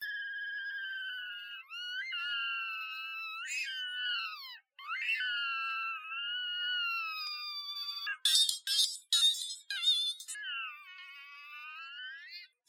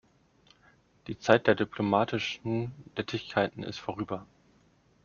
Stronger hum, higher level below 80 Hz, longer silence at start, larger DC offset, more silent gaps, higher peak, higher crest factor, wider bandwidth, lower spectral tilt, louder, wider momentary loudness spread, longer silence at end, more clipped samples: neither; second, under -90 dBFS vs -64 dBFS; second, 0 s vs 1.1 s; neither; neither; second, -12 dBFS vs -4 dBFS; about the same, 26 dB vs 26 dB; first, 17 kHz vs 7.2 kHz; second, 7.5 dB/octave vs -4 dB/octave; second, -33 LUFS vs -30 LUFS; first, 18 LU vs 13 LU; second, 0.2 s vs 0.8 s; neither